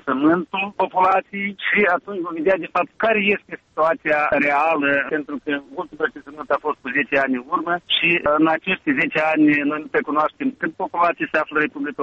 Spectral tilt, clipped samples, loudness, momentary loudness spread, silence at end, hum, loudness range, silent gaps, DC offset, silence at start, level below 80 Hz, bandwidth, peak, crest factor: -6.5 dB/octave; under 0.1%; -20 LUFS; 9 LU; 0 s; none; 3 LU; none; under 0.1%; 0.05 s; -58 dBFS; 7 kHz; -4 dBFS; 16 dB